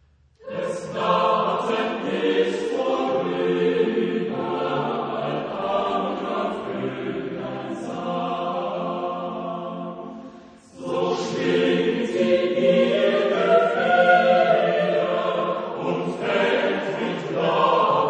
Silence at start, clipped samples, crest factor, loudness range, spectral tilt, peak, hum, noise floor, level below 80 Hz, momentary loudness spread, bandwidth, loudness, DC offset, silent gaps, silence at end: 0.4 s; under 0.1%; 18 dB; 10 LU; -6 dB/octave; -4 dBFS; none; -45 dBFS; -62 dBFS; 12 LU; 9.4 kHz; -22 LUFS; under 0.1%; none; 0 s